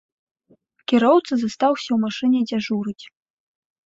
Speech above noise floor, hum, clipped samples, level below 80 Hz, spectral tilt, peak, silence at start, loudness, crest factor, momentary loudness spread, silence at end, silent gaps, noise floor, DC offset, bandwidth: 40 dB; none; under 0.1%; -66 dBFS; -5.5 dB/octave; -4 dBFS; 0.9 s; -20 LUFS; 18 dB; 13 LU; 0.8 s; none; -60 dBFS; under 0.1%; 7.8 kHz